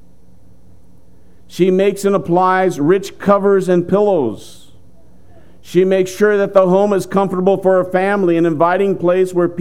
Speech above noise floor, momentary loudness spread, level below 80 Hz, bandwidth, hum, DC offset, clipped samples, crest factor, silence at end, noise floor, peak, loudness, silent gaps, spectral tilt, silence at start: 35 dB; 5 LU; -52 dBFS; 15.5 kHz; none; 2%; under 0.1%; 16 dB; 0 s; -48 dBFS; 0 dBFS; -14 LUFS; none; -7 dB/octave; 1.55 s